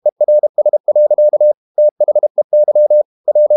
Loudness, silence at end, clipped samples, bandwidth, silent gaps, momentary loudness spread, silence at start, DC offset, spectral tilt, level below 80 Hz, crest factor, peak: -12 LUFS; 0 s; under 0.1%; 1.1 kHz; 0.12-0.16 s, 0.49-0.54 s, 0.80-0.84 s, 1.57-1.75 s, 1.91-1.96 s, 2.30-2.35 s, 2.44-2.50 s, 3.05-3.24 s; 4 LU; 0.05 s; under 0.1%; -11 dB/octave; -82 dBFS; 6 dB; -4 dBFS